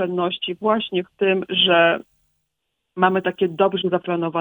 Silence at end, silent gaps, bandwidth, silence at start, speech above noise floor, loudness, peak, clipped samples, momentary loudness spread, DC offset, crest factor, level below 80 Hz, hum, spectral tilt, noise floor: 0 s; none; over 20 kHz; 0 s; 58 dB; -20 LUFS; -2 dBFS; under 0.1%; 8 LU; under 0.1%; 18 dB; -64 dBFS; none; -7.5 dB/octave; -77 dBFS